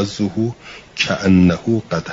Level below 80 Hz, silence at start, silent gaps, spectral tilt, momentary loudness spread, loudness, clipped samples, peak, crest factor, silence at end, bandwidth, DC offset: -48 dBFS; 0 s; none; -6 dB/octave; 13 LU; -17 LUFS; under 0.1%; -2 dBFS; 14 dB; 0 s; 7.8 kHz; under 0.1%